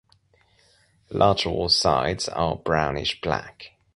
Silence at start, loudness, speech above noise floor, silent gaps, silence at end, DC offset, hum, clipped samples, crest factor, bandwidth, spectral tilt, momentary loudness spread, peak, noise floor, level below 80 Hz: 1.1 s; -23 LUFS; 38 dB; none; 0.3 s; under 0.1%; none; under 0.1%; 22 dB; 11.5 kHz; -4 dB/octave; 10 LU; -4 dBFS; -62 dBFS; -44 dBFS